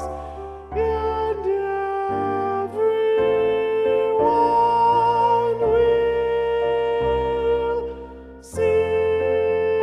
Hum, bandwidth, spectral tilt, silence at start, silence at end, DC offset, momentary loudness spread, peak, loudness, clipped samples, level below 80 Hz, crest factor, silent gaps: none; 10.5 kHz; -6.5 dB/octave; 0 s; 0 s; under 0.1%; 11 LU; -8 dBFS; -20 LUFS; under 0.1%; -42 dBFS; 12 dB; none